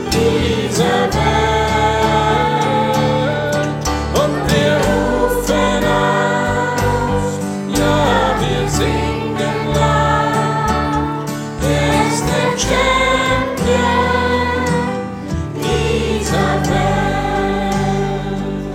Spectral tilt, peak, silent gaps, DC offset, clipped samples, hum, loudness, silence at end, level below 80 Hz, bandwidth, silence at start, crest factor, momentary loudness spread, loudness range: -5 dB/octave; -2 dBFS; none; under 0.1%; under 0.1%; none; -16 LUFS; 0 s; -28 dBFS; 16.5 kHz; 0 s; 14 dB; 5 LU; 2 LU